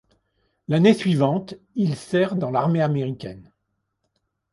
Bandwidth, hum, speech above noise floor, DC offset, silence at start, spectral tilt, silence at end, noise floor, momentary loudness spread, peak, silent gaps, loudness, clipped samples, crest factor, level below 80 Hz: 11.5 kHz; none; 55 dB; under 0.1%; 0.7 s; -7.5 dB/octave; 1.1 s; -76 dBFS; 15 LU; -4 dBFS; none; -21 LUFS; under 0.1%; 20 dB; -60 dBFS